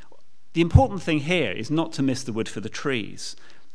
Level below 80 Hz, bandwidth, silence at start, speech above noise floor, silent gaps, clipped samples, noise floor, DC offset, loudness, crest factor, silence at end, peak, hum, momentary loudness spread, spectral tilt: -38 dBFS; 11 kHz; 0.55 s; 34 dB; none; under 0.1%; -58 dBFS; 2%; -24 LUFS; 24 dB; 0.4 s; -2 dBFS; none; 12 LU; -6 dB/octave